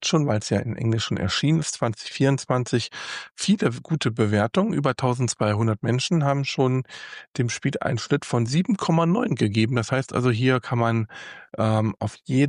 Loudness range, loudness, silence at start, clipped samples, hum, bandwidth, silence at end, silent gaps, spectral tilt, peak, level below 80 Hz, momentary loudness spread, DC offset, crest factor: 2 LU; -23 LUFS; 0 s; under 0.1%; none; 11 kHz; 0 s; 7.28-7.34 s; -5.5 dB/octave; -8 dBFS; -58 dBFS; 6 LU; under 0.1%; 16 dB